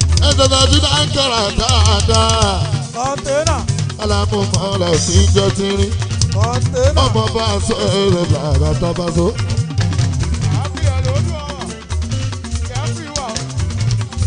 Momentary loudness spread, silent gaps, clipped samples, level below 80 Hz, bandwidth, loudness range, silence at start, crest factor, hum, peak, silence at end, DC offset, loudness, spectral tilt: 10 LU; none; under 0.1%; -26 dBFS; 10 kHz; 6 LU; 0 s; 14 dB; none; 0 dBFS; 0 s; under 0.1%; -15 LUFS; -4.5 dB/octave